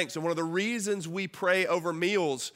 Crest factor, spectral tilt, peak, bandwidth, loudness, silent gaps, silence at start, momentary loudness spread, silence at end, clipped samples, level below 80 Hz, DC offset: 18 dB; -4 dB/octave; -12 dBFS; 16 kHz; -29 LUFS; none; 0 s; 5 LU; 0.05 s; under 0.1%; -78 dBFS; under 0.1%